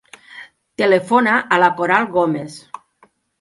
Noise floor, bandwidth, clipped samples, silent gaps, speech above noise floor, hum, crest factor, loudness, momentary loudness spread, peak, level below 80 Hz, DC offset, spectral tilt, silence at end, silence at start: -56 dBFS; 11.5 kHz; under 0.1%; none; 40 dB; none; 18 dB; -16 LUFS; 24 LU; 0 dBFS; -64 dBFS; under 0.1%; -5.5 dB/octave; 0.8 s; 0.35 s